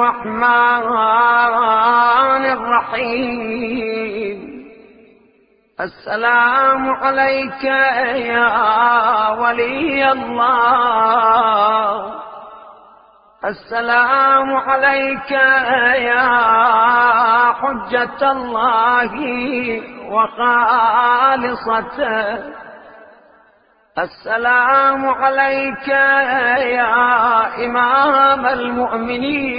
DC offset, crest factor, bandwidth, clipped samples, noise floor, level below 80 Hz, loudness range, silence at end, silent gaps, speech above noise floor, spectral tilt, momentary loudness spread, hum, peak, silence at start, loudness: under 0.1%; 16 dB; 5.2 kHz; under 0.1%; -55 dBFS; -52 dBFS; 6 LU; 0 s; none; 40 dB; -9 dB/octave; 10 LU; none; 0 dBFS; 0 s; -14 LUFS